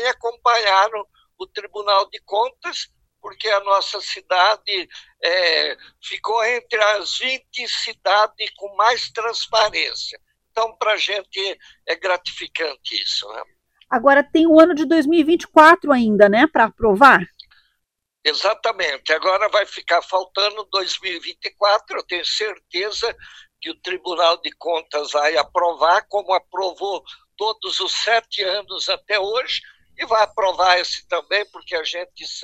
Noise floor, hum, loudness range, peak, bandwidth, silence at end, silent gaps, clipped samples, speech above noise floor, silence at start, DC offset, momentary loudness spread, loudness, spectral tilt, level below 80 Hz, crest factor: -77 dBFS; none; 8 LU; 0 dBFS; 12 kHz; 0 s; none; under 0.1%; 58 dB; 0 s; under 0.1%; 13 LU; -18 LUFS; -3 dB/octave; -58 dBFS; 20 dB